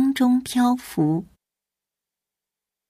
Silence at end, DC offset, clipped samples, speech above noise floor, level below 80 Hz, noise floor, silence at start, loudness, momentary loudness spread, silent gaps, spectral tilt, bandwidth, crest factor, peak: 1.65 s; under 0.1%; under 0.1%; 67 dB; -60 dBFS; -88 dBFS; 0 s; -21 LUFS; 4 LU; none; -6 dB/octave; 15.5 kHz; 14 dB; -10 dBFS